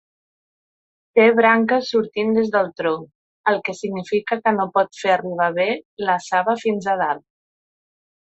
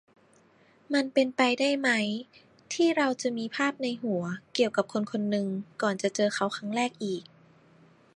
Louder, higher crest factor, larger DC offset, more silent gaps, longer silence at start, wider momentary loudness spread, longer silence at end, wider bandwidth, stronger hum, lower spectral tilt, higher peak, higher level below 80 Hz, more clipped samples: first, -20 LUFS vs -28 LUFS; about the same, 18 dB vs 20 dB; neither; first, 3.15-3.44 s, 5.85-5.97 s vs none; first, 1.15 s vs 0.9 s; about the same, 9 LU vs 8 LU; first, 1.2 s vs 0.95 s; second, 8.2 kHz vs 11.5 kHz; neither; about the same, -5.5 dB/octave vs -4.5 dB/octave; first, -2 dBFS vs -10 dBFS; first, -66 dBFS vs -78 dBFS; neither